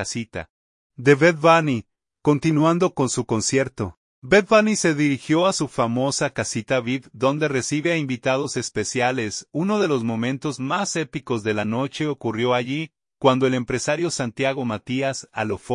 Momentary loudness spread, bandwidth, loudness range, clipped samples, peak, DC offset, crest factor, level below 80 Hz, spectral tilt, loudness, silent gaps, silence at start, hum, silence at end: 10 LU; 11 kHz; 4 LU; under 0.1%; -2 dBFS; under 0.1%; 20 dB; -58 dBFS; -5 dB/octave; -22 LUFS; 0.50-0.90 s, 3.97-4.22 s; 0 s; none; 0 s